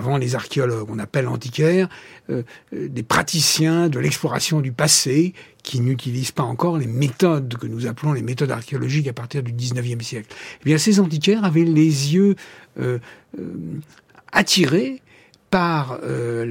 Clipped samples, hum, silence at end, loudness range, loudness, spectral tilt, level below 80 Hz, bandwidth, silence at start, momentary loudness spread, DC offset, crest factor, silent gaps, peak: under 0.1%; none; 0 s; 4 LU; -20 LUFS; -4.5 dB/octave; -56 dBFS; 16.5 kHz; 0 s; 15 LU; under 0.1%; 18 dB; none; -2 dBFS